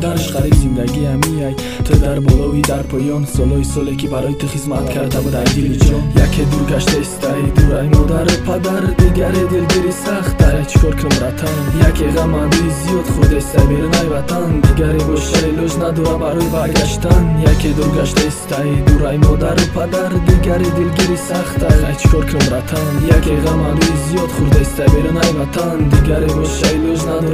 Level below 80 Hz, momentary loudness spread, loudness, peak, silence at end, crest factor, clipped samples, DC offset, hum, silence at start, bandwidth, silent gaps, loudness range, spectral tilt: -18 dBFS; 5 LU; -14 LUFS; 0 dBFS; 0 s; 12 dB; 0.1%; under 0.1%; none; 0 s; 16 kHz; none; 2 LU; -6 dB/octave